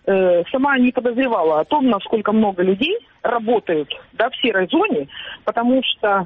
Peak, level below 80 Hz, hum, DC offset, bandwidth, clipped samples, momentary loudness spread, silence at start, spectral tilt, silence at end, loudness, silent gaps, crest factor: -6 dBFS; -56 dBFS; none; under 0.1%; 4.1 kHz; under 0.1%; 7 LU; 0.05 s; -3 dB/octave; 0 s; -18 LUFS; none; 12 dB